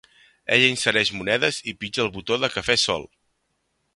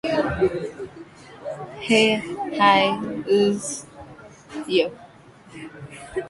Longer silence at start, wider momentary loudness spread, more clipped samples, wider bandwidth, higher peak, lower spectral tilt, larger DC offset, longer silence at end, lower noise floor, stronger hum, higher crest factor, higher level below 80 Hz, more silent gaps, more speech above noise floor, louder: first, 0.5 s vs 0.05 s; second, 11 LU vs 23 LU; neither; about the same, 11.5 kHz vs 11.5 kHz; about the same, -2 dBFS vs -2 dBFS; second, -2.5 dB/octave vs -4 dB/octave; neither; first, 0.9 s vs 0 s; first, -73 dBFS vs -47 dBFS; neither; about the same, 22 dB vs 20 dB; second, -56 dBFS vs -50 dBFS; neither; first, 50 dB vs 27 dB; about the same, -21 LUFS vs -21 LUFS